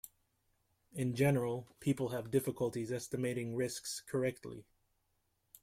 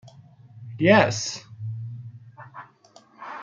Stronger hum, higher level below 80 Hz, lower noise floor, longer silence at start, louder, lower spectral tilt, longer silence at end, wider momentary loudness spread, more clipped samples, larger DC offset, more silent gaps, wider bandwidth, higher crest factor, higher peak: neither; about the same, -70 dBFS vs -68 dBFS; first, -80 dBFS vs -55 dBFS; about the same, 0.05 s vs 0.05 s; second, -37 LUFS vs -22 LUFS; about the same, -6 dB/octave vs -5 dB/octave; first, 1 s vs 0 s; second, 18 LU vs 27 LU; neither; neither; neither; first, 16 kHz vs 9.2 kHz; about the same, 20 dB vs 24 dB; second, -18 dBFS vs -2 dBFS